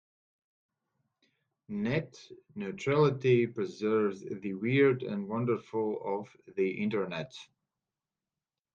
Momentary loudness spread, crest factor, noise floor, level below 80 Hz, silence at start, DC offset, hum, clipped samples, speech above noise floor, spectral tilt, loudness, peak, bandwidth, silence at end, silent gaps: 15 LU; 18 dB; under -90 dBFS; -72 dBFS; 1.7 s; under 0.1%; none; under 0.1%; over 59 dB; -7.5 dB/octave; -31 LUFS; -14 dBFS; 7.6 kHz; 1.3 s; none